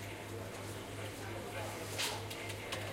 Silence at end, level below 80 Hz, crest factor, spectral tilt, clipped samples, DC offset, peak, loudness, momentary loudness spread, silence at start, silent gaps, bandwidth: 0 s; -62 dBFS; 18 dB; -3.5 dB/octave; under 0.1%; under 0.1%; -24 dBFS; -42 LUFS; 7 LU; 0 s; none; 16.5 kHz